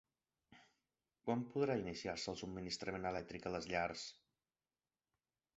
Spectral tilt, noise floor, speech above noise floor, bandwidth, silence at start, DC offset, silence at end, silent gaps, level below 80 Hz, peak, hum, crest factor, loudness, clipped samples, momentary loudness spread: -4 dB/octave; under -90 dBFS; over 48 dB; 8 kHz; 0.5 s; under 0.1%; 1.45 s; none; -68 dBFS; -24 dBFS; none; 22 dB; -43 LUFS; under 0.1%; 8 LU